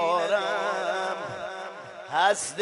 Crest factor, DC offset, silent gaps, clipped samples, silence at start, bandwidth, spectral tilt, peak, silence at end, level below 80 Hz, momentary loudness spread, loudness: 18 dB; under 0.1%; none; under 0.1%; 0 s; 11.5 kHz; -2 dB/octave; -10 dBFS; 0 s; -74 dBFS; 14 LU; -27 LUFS